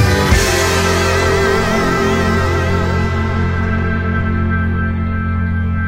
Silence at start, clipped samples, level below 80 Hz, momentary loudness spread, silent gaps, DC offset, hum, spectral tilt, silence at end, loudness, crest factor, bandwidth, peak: 0 s; under 0.1%; -24 dBFS; 5 LU; none; 0.2%; none; -5 dB/octave; 0 s; -15 LUFS; 12 dB; 16.5 kHz; -2 dBFS